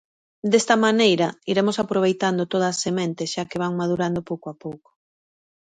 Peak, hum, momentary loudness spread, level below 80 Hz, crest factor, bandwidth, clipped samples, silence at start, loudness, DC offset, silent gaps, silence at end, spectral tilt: -4 dBFS; none; 13 LU; -62 dBFS; 20 dB; 9.6 kHz; under 0.1%; 0.45 s; -22 LUFS; under 0.1%; none; 0.85 s; -4.5 dB/octave